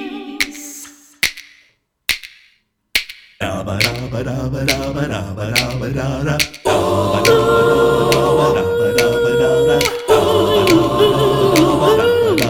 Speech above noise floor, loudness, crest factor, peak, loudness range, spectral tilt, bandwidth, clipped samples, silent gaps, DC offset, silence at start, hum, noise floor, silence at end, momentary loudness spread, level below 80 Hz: 38 dB; -15 LUFS; 14 dB; -2 dBFS; 9 LU; -4.5 dB/octave; over 20 kHz; under 0.1%; none; under 0.1%; 0 s; none; -57 dBFS; 0 s; 10 LU; -38 dBFS